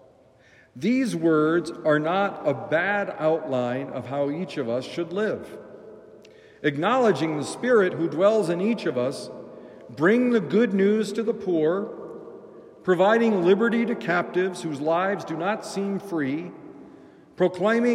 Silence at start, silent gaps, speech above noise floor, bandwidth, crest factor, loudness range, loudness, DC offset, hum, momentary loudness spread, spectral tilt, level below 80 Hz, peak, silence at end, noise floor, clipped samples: 0.75 s; none; 32 dB; 13 kHz; 16 dB; 5 LU; -24 LUFS; under 0.1%; none; 16 LU; -6.5 dB/octave; -72 dBFS; -8 dBFS; 0 s; -55 dBFS; under 0.1%